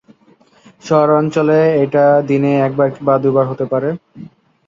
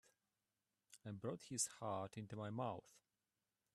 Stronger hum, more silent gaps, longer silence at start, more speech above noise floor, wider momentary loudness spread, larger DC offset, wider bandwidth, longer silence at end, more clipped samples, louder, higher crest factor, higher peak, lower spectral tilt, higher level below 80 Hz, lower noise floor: neither; neither; about the same, 0.85 s vs 0.9 s; second, 37 dB vs over 42 dB; second, 6 LU vs 12 LU; neither; second, 7.6 kHz vs 13.5 kHz; second, 0.4 s vs 0.75 s; neither; first, -14 LUFS vs -47 LUFS; second, 14 dB vs 24 dB; first, -2 dBFS vs -28 dBFS; first, -8 dB/octave vs -4 dB/octave; first, -58 dBFS vs -84 dBFS; second, -50 dBFS vs under -90 dBFS